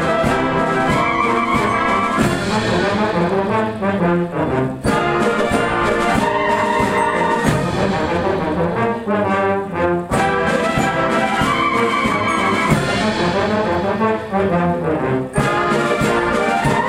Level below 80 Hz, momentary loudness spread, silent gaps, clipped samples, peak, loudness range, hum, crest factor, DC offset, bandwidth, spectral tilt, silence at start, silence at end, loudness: -38 dBFS; 3 LU; none; under 0.1%; -2 dBFS; 1 LU; none; 14 dB; under 0.1%; 16 kHz; -5.5 dB/octave; 0 s; 0 s; -17 LUFS